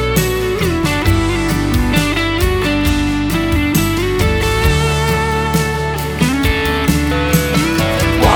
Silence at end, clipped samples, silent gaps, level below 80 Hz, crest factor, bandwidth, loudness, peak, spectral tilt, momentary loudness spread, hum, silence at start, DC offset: 0 s; under 0.1%; none; -22 dBFS; 14 dB; over 20 kHz; -15 LUFS; 0 dBFS; -5 dB/octave; 2 LU; none; 0 s; under 0.1%